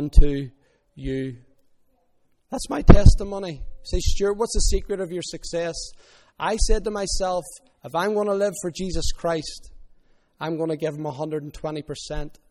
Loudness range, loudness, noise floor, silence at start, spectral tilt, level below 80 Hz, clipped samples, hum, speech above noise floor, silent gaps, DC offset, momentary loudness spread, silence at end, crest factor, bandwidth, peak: 7 LU; -25 LUFS; -63 dBFS; 0 s; -5.5 dB/octave; -24 dBFS; under 0.1%; none; 43 dB; none; under 0.1%; 13 LU; 0.2 s; 22 dB; 12 kHz; 0 dBFS